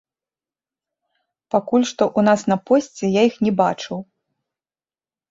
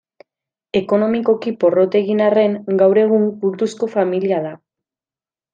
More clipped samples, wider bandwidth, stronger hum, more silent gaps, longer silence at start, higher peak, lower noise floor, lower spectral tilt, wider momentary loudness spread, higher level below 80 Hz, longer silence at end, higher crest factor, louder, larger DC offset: neither; second, 7.8 kHz vs 9 kHz; neither; neither; first, 1.55 s vs 0.75 s; about the same, -2 dBFS vs -2 dBFS; about the same, under -90 dBFS vs under -90 dBFS; second, -5.5 dB/octave vs -7.5 dB/octave; about the same, 8 LU vs 7 LU; about the same, -62 dBFS vs -64 dBFS; first, 1.3 s vs 1 s; about the same, 18 dB vs 16 dB; about the same, -19 LUFS vs -17 LUFS; neither